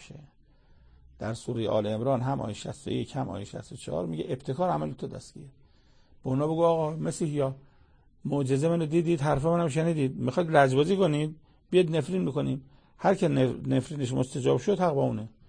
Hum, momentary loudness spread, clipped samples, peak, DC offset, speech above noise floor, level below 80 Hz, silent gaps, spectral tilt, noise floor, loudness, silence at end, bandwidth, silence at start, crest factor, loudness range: none; 12 LU; under 0.1%; -8 dBFS; under 0.1%; 32 dB; -56 dBFS; none; -7 dB/octave; -59 dBFS; -28 LUFS; 0.2 s; 9.8 kHz; 0 s; 20 dB; 7 LU